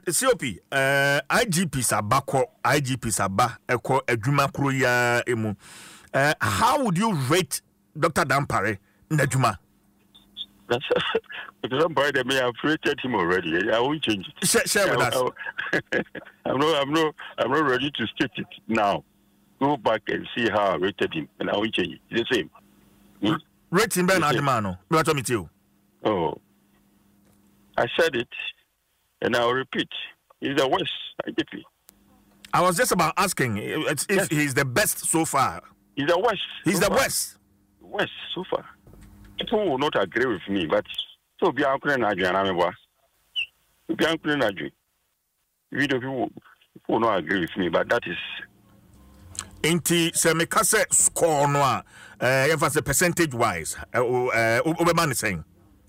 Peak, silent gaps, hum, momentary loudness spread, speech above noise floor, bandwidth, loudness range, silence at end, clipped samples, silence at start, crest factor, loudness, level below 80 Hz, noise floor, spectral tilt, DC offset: -10 dBFS; none; none; 11 LU; 50 dB; 16 kHz; 5 LU; 0.45 s; under 0.1%; 0.05 s; 16 dB; -24 LUFS; -54 dBFS; -74 dBFS; -3.5 dB/octave; under 0.1%